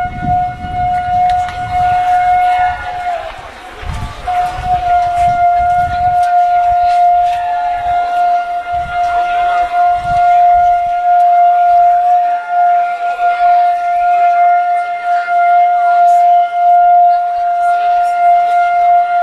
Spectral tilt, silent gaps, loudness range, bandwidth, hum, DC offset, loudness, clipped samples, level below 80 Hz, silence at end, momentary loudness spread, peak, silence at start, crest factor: -5 dB/octave; none; 5 LU; 9.4 kHz; none; under 0.1%; -11 LUFS; under 0.1%; -34 dBFS; 0 s; 9 LU; -2 dBFS; 0 s; 8 dB